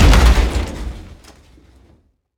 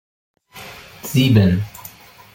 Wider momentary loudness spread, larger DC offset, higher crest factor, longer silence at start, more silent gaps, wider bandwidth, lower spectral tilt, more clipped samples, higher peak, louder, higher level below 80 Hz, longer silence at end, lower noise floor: second, 20 LU vs 23 LU; neither; about the same, 16 dB vs 18 dB; second, 0 s vs 0.55 s; neither; about the same, 15.5 kHz vs 17 kHz; second, -5 dB/octave vs -6.5 dB/octave; neither; about the same, 0 dBFS vs -2 dBFS; about the same, -16 LUFS vs -16 LUFS; first, -16 dBFS vs -48 dBFS; first, 1.35 s vs 0.45 s; first, -54 dBFS vs -41 dBFS